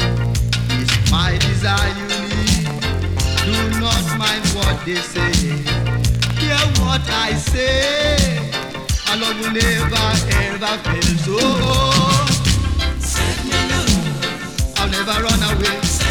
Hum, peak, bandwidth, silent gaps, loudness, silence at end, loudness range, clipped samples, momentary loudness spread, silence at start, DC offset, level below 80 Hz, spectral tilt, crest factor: none; -4 dBFS; 19.5 kHz; none; -17 LUFS; 0 s; 2 LU; under 0.1%; 5 LU; 0 s; under 0.1%; -24 dBFS; -4 dB/octave; 14 dB